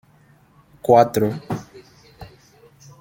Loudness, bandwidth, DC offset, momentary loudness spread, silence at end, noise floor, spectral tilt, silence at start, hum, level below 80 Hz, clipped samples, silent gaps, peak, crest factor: -19 LUFS; 17 kHz; under 0.1%; 16 LU; 0.75 s; -54 dBFS; -6.5 dB/octave; 0.85 s; none; -56 dBFS; under 0.1%; none; -2 dBFS; 22 dB